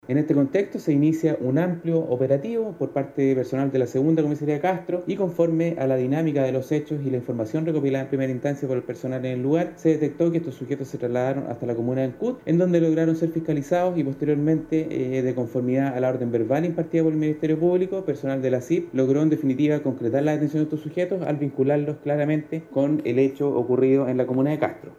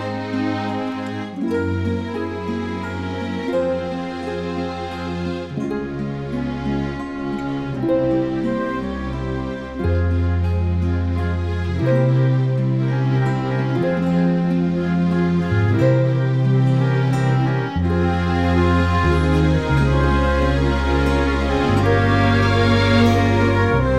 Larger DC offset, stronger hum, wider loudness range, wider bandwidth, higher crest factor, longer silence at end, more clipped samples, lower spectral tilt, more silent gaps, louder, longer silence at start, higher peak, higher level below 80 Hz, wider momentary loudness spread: second, under 0.1% vs 0.3%; neither; second, 2 LU vs 7 LU; first, 13.5 kHz vs 9.6 kHz; about the same, 14 dB vs 16 dB; about the same, 0.05 s vs 0 s; neither; about the same, -8.5 dB/octave vs -8 dB/octave; neither; second, -23 LUFS vs -19 LUFS; about the same, 0.1 s vs 0 s; second, -8 dBFS vs -4 dBFS; second, -62 dBFS vs -30 dBFS; second, 6 LU vs 10 LU